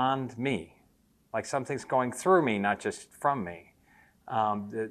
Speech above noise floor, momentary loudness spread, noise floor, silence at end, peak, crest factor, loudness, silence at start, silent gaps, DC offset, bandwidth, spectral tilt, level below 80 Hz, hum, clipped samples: 37 dB; 12 LU; -66 dBFS; 0 s; -10 dBFS; 20 dB; -30 LUFS; 0 s; none; under 0.1%; 13 kHz; -5.5 dB/octave; -68 dBFS; none; under 0.1%